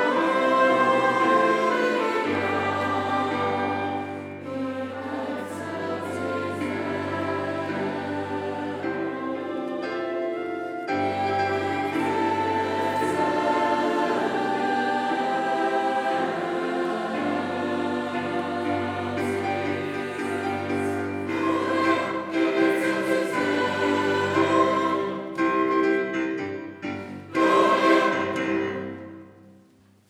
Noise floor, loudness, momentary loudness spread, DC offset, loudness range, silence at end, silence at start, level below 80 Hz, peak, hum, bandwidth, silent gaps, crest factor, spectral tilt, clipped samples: -57 dBFS; -25 LUFS; 10 LU; under 0.1%; 6 LU; 0.6 s; 0 s; -76 dBFS; -6 dBFS; none; 14 kHz; none; 18 dB; -5.5 dB/octave; under 0.1%